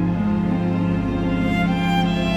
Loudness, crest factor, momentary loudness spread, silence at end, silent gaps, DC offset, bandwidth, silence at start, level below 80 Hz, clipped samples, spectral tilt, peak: -20 LUFS; 10 dB; 2 LU; 0 s; none; under 0.1%; 8.2 kHz; 0 s; -34 dBFS; under 0.1%; -7.5 dB/octave; -8 dBFS